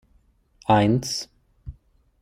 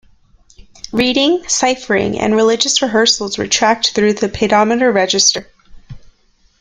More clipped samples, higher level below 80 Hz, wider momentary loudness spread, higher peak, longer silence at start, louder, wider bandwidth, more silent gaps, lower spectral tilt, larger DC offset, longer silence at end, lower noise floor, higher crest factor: neither; second, -50 dBFS vs -44 dBFS; first, 25 LU vs 5 LU; second, -6 dBFS vs 0 dBFS; second, 0.7 s vs 0.85 s; second, -22 LUFS vs -13 LUFS; first, 15.5 kHz vs 11 kHz; neither; first, -5.5 dB/octave vs -2.5 dB/octave; neither; about the same, 0.5 s vs 0.55 s; first, -61 dBFS vs -54 dBFS; about the same, 20 dB vs 16 dB